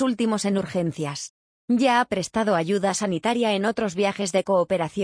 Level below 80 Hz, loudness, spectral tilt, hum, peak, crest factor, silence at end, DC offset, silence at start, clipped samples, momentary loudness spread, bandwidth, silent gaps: -60 dBFS; -23 LUFS; -5 dB/octave; none; -8 dBFS; 16 dB; 0 s; under 0.1%; 0 s; under 0.1%; 7 LU; 10.5 kHz; 1.30-1.68 s